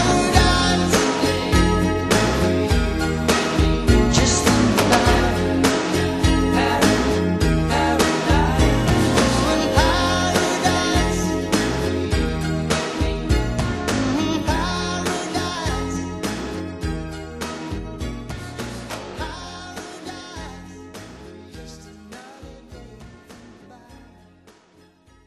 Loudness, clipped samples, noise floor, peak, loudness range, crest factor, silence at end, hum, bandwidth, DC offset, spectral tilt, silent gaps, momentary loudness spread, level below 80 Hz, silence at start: -19 LUFS; under 0.1%; -54 dBFS; 0 dBFS; 17 LU; 20 dB; 1.3 s; none; 13 kHz; under 0.1%; -4.5 dB/octave; none; 18 LU; -28 dBFS; 0 s